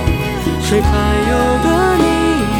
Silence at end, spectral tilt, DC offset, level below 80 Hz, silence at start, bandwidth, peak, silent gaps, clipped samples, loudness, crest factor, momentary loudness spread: 0 s; -5.5 dB/octave; under 0.1%; -22 dBFS; 0 s; 17.5 kHz; -2 dBFS; none; under 0.1%; -14 LUFS; 12 dB; 5 LU